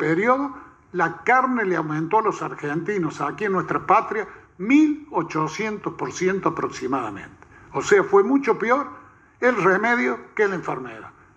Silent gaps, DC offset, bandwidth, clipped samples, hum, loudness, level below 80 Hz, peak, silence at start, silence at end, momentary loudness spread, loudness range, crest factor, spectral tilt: none; under 0.1%; 8.4 kHz; under 0.1%; none; -22 LUFS; -60 dBFS; -4 dBFS; 0 s; 0.25 s; 13 LU; 3 LU; 18 dB; -6 dB/octave